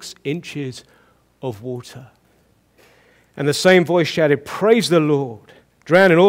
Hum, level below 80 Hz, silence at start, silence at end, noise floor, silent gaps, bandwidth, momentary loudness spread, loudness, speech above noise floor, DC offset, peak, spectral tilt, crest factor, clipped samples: none; -62 dBFS; 0 s; 0 s; -58 dBFS; none; 16 kHz; 18 LU; -17 LUFS; 41 dB; under 0.1%; -2 dBFS; -5.5 dB/octave; 18 dB; under 0.1%